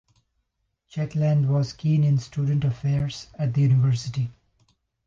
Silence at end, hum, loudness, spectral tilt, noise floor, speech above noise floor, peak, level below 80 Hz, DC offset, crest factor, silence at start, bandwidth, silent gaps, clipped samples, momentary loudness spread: 0.75 s; none; -24 LUFS; -8 dB/octave; -76 dBFS; 53 dB; -12 dBFS; -54 dBFS; under 0.1%; 12 dB; 0.95 s; 7.4 kHz; none; under 0.1%; 10 LU